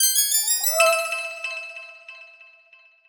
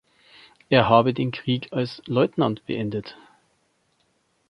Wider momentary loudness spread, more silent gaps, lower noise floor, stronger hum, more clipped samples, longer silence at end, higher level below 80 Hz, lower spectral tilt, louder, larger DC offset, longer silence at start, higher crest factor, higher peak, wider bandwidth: first, 22 LU vs 12 LU; neither; second, -54 dBFS vs -68 dBFS; neither; neither; second, 0.65 s vs 1.35 s; second, -72 dBFS vs -58 dBFS; second, 3.5 dB/octave vs -8 dB/octave; first, -20 LUFS vs -23 LUFS; neither; second, 0 s vs 0.7 s; about the same, 20 dB vs 22 dB; about the same, -4 dBFS vs -2 dBFS; first, over 20 kHz vs 6.2 kHz